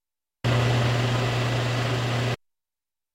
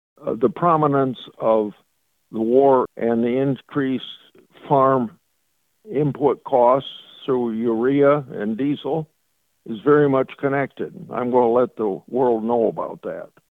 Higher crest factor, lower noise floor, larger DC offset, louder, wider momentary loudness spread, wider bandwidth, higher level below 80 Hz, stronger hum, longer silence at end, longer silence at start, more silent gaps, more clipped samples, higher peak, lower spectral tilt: about the same, 14 dB vs 16 dB; first, under -90 dBFS vs -70 dBFS; neither; second, -25 LUFS vs -20 LUFS; second, 7 LU vs 13 LU; first, 12.5 kHz vs 4.1 kHz; first, -46 dBFS vs -62 dBFS; neither; first, 0.8 s vs 0.25 s; first, 0.45 s vs 0.2 s; neither; neither; second, -12 dBFS vs -4 dBFS; second, -5.5 dB/octave vs -9.5 dB/octave